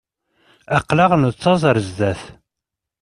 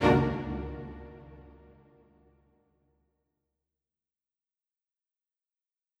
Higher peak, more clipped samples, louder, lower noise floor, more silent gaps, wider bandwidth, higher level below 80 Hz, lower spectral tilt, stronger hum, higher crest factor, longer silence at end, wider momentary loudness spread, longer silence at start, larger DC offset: first, 0 dBFS vs -10 dBFS; neither; first, -17 LUFS vs -31 LUFS; second, -84 dBFS vs -90 dBFS; neither; about the same, 11 kHz vs 10.5 kHz; about the same, -48 dBFS vs -50 dBFS; second, -6.5 dB/octave vs -8 dB/octave; neither; second, 18 dB vs 26 dB; second, 0.7 s vs 4.5 s; second, 7 LU vs 27 LU; first, 0.7 s vs 0 s; neither